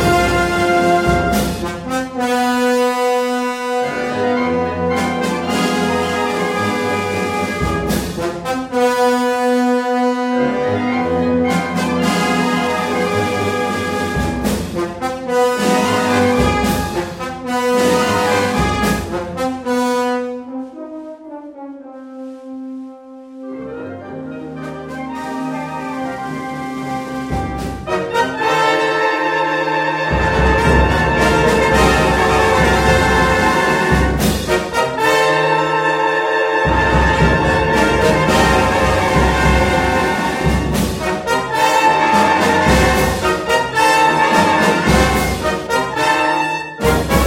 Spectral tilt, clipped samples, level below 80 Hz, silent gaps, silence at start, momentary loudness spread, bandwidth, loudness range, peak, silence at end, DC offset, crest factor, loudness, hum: -5 dB/octave; under 0.1%; -28 dBFS; none; 0 s; 13 LU; 16.5 kHz; 11 LU; 0 dBFS; 0 s; under 0.1%; 16 dB; -15 LUFS; none